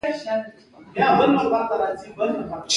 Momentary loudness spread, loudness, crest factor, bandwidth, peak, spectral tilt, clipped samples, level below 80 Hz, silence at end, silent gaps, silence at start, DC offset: 12 LU; -22 LUFS; 18 dB; 11.5 kHz; -4 dBFS; -4 dB/octave; under 0.1%; -56 dBFS; 0 s; none; 0.05 s; under 0.1%